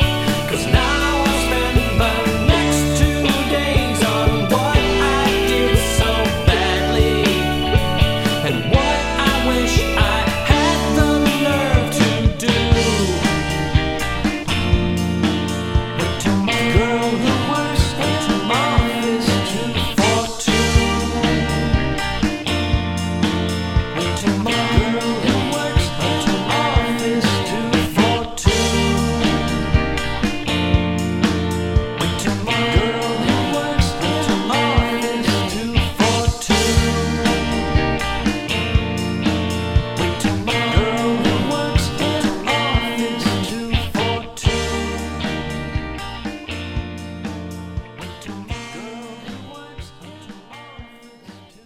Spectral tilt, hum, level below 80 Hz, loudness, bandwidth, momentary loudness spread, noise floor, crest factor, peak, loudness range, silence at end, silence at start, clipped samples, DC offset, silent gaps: -5 dB/octave; none; -26 dBFS; -18 LUFS; 16.5 kHz; 9 LU; -42 dBFS; 18 dB; 0 dBFS; 7 LU; 0.2 s; 0 s; under 0.1%; under 0.1%; none